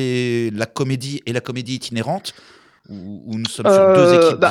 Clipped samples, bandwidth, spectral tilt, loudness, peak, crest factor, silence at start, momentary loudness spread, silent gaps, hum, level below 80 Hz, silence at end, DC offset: under 0.1%; 14 kHz; -5.5 dB/octave; -17 LUFS; 0 dBFS; 18 dB; 0 s; 19 LU; none; none; -64 dBFS; 0 s; under 0.1%